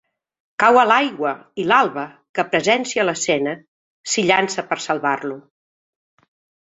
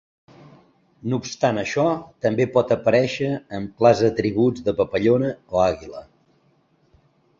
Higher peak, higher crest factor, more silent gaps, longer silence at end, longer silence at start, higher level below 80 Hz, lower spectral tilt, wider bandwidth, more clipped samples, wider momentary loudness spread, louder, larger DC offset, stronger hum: about the same, -2 dBFS vs -2 dBFS; about the same, 20 dB vs 20 dB; first, 2.29-2.34 s, 3.68-4.04 s vs none; second, 1.25 s vs 1.4 s; second, 0.6 s vs 1.05 s; second, -66 dBFS vs -52 dBFS; second, -3 dB/octave vs -6.5 dB/octave; about the same, 8.2 kHz vs 7.6 kHz; neither; first, 16 LU vs 10 LU; first, -18 LUFS vs -21 LUFS; neither; neither